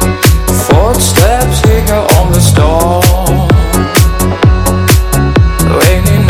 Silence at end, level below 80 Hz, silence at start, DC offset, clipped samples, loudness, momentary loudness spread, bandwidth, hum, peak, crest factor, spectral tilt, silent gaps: 0 s; -12 dBFS; 0 s; under 0.1%; 3%; -8 LUFS; 2 LU; over 20 kHz; none; 0 dBFS; 8 dB; -5 dB/octave; none